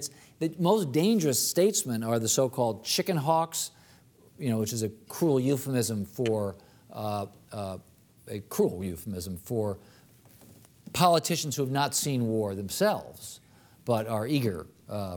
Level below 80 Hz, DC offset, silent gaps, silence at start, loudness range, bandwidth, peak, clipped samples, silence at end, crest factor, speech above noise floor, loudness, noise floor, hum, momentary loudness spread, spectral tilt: -64 dBFS; under 0.1%; none; 0 s; 8 LU; over 20 kHz; -8 dBFS; under 0.1%; 0 s; 20 dB; 30 dB; -28 LUFS; -58 dBFS; none; 15 LU; -4.5 dB/octave